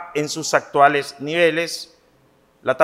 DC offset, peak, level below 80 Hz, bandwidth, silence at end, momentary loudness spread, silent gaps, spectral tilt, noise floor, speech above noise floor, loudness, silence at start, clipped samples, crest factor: under 0.1%; 0 dBFS; -68 dBFS; 16 kHz; 0 s; 13 LU; none; -3.5 dB/octave; -57 dBFS; 38 dB; -19 LUFS; 0 s; under 0.1%; 20 dB